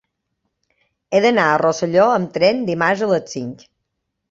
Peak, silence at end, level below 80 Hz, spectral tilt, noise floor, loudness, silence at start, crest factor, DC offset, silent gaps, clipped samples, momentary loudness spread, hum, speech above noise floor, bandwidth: -2 dBFS; 0.75 s; -60 dBFS; -5 dB/octave; -76 dBFS; -17 LUFS; 1.1 s; 18 dB; under 0.1%; none; under 0.1%; 9 LU; none; 59 dB; 7.8 kHz